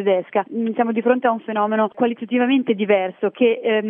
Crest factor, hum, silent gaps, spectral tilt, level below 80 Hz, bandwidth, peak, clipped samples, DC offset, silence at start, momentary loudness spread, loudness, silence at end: 16 dB; none; none; -10 dB/octave; -86 dBFS; 3.7 kHz; -4 dBFS; under 0.1%; under 0.1%; 0 s; 4 LU; -20 LUFS; 0 s